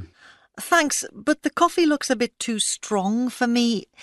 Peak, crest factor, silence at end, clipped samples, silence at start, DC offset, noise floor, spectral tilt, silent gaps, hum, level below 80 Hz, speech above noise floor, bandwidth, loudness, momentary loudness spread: -4 dBFS; 18 dB; 0 s; under 0.1%; 0 s; under 0.1%; -53 dBFS; -3 dB/octave; none; none; -62 dBFS; 31 dB; 12.5 kHz; -22 LUFS; 5 LU